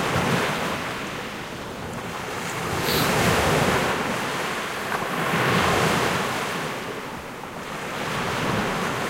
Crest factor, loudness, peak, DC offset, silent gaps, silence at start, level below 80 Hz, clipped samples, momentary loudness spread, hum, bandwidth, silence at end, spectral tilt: 18 dB; -24 LUFS; -8 dBFS; under 0.1%; none; 0 s; -46 dBFS; under 0.1%; 13 LU; none; 16 kHz; 0 s; -4 dB/octave